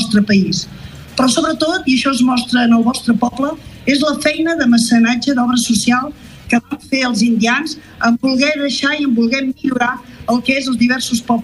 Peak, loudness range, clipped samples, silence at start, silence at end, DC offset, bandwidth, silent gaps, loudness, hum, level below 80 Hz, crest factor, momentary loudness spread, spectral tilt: -2 dBFS; 2 LU; under 0.1%; 0 s; 0 s; under 0.1%; 12.5 kHz; none; -15 LUFS; none; -46 dBFS; 14 dB; 6 LU; -4 dB/octave